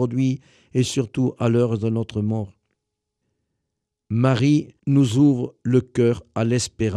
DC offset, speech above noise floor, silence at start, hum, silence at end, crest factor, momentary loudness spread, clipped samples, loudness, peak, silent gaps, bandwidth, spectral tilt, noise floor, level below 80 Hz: under 0.1%; 60 dB; 0 s; none; 0 s; 16 dB; 8 LU; under 0.1%; -21 LUFS; -6 dBFS; none; 11.5 kHz; -7 dB/octave; -80 dBFS; -54 dBFS